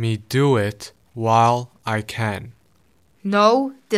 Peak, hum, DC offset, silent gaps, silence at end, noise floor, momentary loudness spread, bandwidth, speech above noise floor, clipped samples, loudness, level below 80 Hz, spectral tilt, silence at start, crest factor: -2 dBFS; none; under 0.1%; none; 0 s; -60 dBFS; 16 LU; 16 kHz; 41 dB; under 0.1%; -20 LUFS; -58 dBFS; -6 dB/octave; 0 s; 18 dB